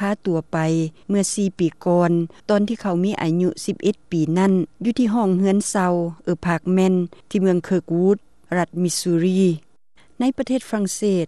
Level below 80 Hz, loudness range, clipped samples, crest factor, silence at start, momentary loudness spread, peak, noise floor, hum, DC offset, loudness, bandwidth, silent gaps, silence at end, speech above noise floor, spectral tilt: -58 dBFS; 1 LU; under 0.1%; 14 dB; 0 s; 6 LU; -6 dBFS; -58 dBFS; none; 0.3%; -21 LUFS; 12.5 kHz; none; 0 s; 39 dB; -6 dB/octave